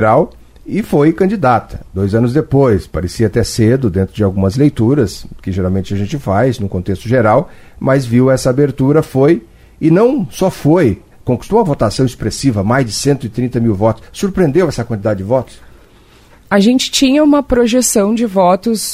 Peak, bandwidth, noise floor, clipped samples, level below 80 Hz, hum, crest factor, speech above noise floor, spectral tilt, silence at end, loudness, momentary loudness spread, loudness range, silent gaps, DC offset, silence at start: 0 dBFS; 16 kHz; -43 dBFS; under 0.1%; -36 dBFS; none; 12 dB; 31 dB; -6 dB/octave; 0 s; -13 LUFS; 8 LU; 3 LU; none; under 0.1%; 0 s